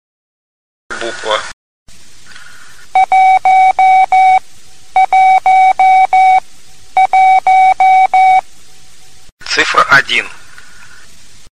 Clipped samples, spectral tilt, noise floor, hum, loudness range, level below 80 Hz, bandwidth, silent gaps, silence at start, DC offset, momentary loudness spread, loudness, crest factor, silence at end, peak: under 0.1%; -1.5 dB/octave; -43 dBFS; none; 5 LU; -48 dBFS; 10.5 kHz; 1.53-1.86 s, 9.32-9.37 s; 0.9 s; 3%; 10 LU; -9 LUFS; 12 dB; 0 s; 0 dBFS